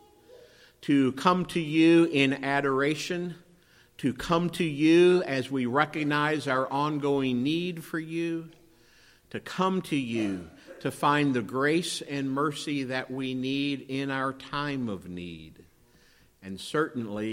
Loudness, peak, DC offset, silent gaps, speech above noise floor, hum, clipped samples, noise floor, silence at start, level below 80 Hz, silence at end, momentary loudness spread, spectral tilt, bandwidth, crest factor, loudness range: -27 LUFS; -6 dBFS; under 0.1%; none; 33 dB; none; under 0.1%; -60 dBFS; 0.35 s; -62 dBFS; 0 s; 15 LU; -5.5 dB/octave; 16 kHz; 22 dB; 7 LU